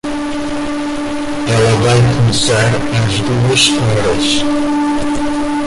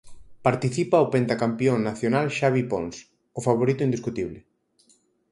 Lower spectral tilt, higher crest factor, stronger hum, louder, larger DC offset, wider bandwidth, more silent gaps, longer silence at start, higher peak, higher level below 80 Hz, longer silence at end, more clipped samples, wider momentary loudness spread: second, -5 dB/octave vs -6.5 dB/octave; second, 14 dB vs 20 dB; neither; first, -13 LUFS vs -24 LUFS; neither; about the same, 11.5 kHz vs 11.5 kHz; neither; about the same, 0.05 s vs 0.05 s; first, 0 dBFS vs -6 dBFS; first, -32 dBFS vs -58 dBFS; second, 0 s vs 0.9 s; neither; about the same, 9 LU vs 11 LU